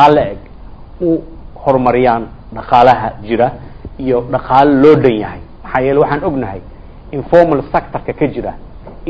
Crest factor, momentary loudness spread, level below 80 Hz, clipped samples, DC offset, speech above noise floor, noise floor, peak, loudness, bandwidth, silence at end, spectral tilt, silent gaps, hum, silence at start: 12 dB; 17 LU; -34 dBFS; 0.9%; under 0.1%; 20 dB; -32 dBFS; 0 dBFS; -13 LUFS; 8 kHz; 0 s; -8.5 dB/octave; none; none; 0 s